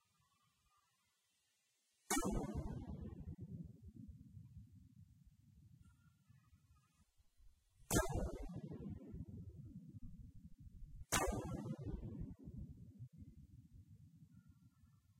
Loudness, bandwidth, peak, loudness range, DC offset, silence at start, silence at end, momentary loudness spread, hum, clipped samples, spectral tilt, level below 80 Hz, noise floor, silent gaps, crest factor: -46 LUFS; 15.5 kHz; -22 dBFS; 13 LU; under 0.1%; 2.1 s; 0.05 s; 25 LU; none; under 0.1%; -4.5 dB/octave; -56 dBFS; -83 dBFS; none; 28 dB